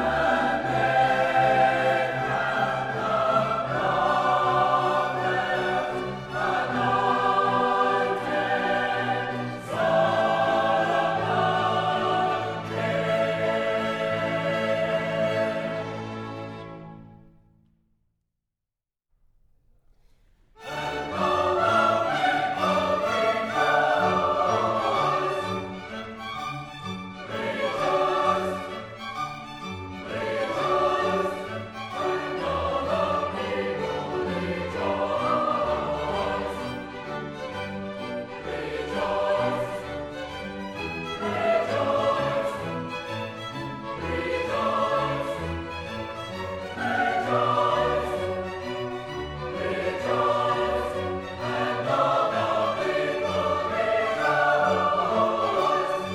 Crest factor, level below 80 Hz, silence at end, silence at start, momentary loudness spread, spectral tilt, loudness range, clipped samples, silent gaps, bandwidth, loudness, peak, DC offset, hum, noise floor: 16 dB; -52 dBFS; 0 s; 0 s; 12 LU; -5.5 dB/octave; 6 LU; under 0.1%; none; 13.5 kHz; -25 LUFS; -8 dBFS; under 0.1%; none; -88 dBFS